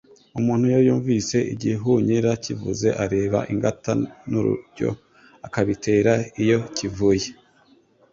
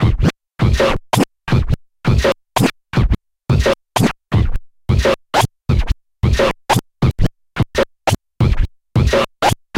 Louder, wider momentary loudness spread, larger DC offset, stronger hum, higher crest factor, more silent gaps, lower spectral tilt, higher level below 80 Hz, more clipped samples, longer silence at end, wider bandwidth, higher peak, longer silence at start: second, -22 LUFS vs -18 LUFS; first, 9 LU vs 5 LU; neither; neither; about the same, 18 dB vs 14 dB; neither; about the same, -6 dB/octave vs -6 dB/octave; second, -50 dBFS vs -22 dBFS; neither; first, 0.8 s vs 0 s; second, 7.8 kHz vs 16.5 kHz; about the same, -4 dBFS vs -2 dBFS; first, 0.35 s vs 0 s